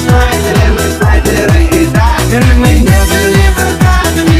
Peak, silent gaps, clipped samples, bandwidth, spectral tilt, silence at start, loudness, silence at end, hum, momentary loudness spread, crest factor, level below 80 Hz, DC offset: 0 dBFS; none; 0.4%; 16 kHz; -5.5 dB/octave; 0 s; -8 LUFS; 0 s; none; 2 LU; 8 dB; -12 dBFS; under 0.1%